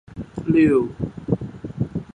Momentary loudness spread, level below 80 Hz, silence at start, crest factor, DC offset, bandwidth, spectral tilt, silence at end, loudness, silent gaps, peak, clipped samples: 15 LU; -44 dBFS; 0.1 s; 16 dB; under 0.1%; 9.4 kHz; -9.5 dB/octave; 0.1 s; -22 LUFS; none; -6 dBFS; under 0.1%